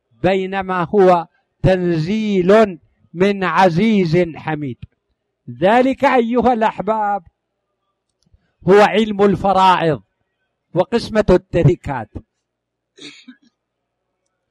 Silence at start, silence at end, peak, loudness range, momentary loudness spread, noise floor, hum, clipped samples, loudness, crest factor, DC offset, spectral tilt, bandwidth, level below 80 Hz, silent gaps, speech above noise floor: 0.25 s; 1.2 s; -2 dBFS; 4 LU; 12 LU; -77 dBFS; none; under 0.1%; -16 LUFS; 16 dB; under 0.1%; -7 dB/octave; 11.5 kHz; -42 dBFS; none; 62 dB